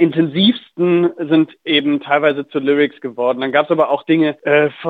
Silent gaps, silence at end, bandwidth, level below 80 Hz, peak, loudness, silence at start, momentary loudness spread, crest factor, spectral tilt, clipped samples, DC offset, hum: none; 0 s; 4.7 kHz; -68 dBFS; 0 dBFS; -16 LUFS; 0 s; 4 LU; 14 dB; -8 dB/octave; under 0.1%; under 0.1%; none